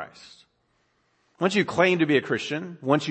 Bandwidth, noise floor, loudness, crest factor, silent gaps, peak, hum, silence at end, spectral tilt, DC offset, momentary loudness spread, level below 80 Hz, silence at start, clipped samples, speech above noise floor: 8.6 kHz; -70 dBFS; -24 LUFS; 20 dB; none; -6 dBFS; none; 0 s; -5.5 dB/octave; under 0.1%; 10 LU; -70 dBFS; 0 s; under 0.1%; 46 dB